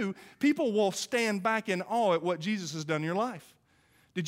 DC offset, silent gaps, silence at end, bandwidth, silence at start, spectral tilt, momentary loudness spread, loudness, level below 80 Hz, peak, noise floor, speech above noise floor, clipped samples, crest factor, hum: under 0.1%; none; 0 s; 16 kHz; 0 s; -5 dB/octave; 8 LU; -30 LUFS; -78 dBFS; -14 dBFS; -66 dBFS; 36 dB; under 0.1%; 16 dB; none